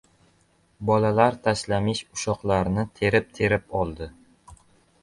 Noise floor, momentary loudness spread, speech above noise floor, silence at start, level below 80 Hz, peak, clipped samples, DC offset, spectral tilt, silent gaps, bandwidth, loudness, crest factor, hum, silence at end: -63 dBFS; 9 LU; 40 dB; 0.8 s; -46 dBFS; -4 dBFS; under 0.1%; under 0.1%; -5.5 dB/octave; none; 11.5 kHz; -24 LUFS; 20 dB; none; 0.5 s